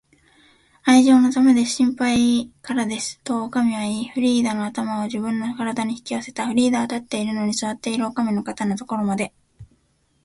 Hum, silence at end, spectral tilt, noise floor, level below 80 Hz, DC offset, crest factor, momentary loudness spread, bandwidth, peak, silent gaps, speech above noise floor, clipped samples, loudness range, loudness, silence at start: none; 0.6 s; -4.5 dB/octave; -64 dBFS; -58 dBFS; under 0.1%; 18 dB; 11 LU; 11.5 kHz; -4 dBFS; none; 44 dB; under 0.1%; 5 LU; -21 LUFS; 0.85 s